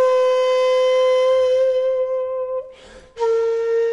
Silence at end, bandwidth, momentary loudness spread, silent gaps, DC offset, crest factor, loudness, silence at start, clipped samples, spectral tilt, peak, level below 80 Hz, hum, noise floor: 0 s; 11 kHz; 8 LU; none; under 0.1%; 10 dB; -18 LUFS; 0 s; under 0.1%; -1 dB/octave; -8 dBFS; -58 dBFS; none; -42 dBFS